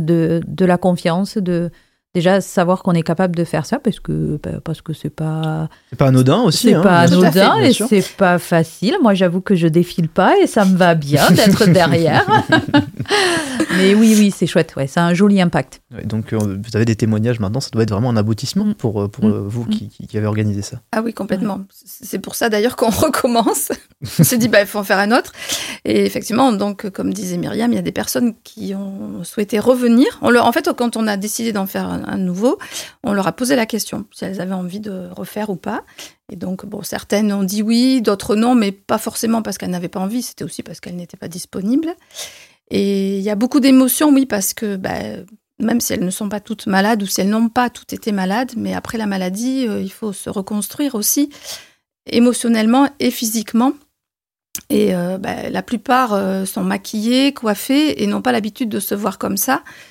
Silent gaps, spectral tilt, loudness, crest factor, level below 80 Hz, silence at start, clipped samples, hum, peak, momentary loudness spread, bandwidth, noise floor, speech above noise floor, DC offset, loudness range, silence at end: none; -5 dB/octave; -16 LUFS; 16 dB; -50 dBFS; 0 s; under 0.1%; none; 0 dBFS; 14 LU; 17 kHz; -89 dBFS; 73 dB; under 0.1%; 8 LU; 0.05 s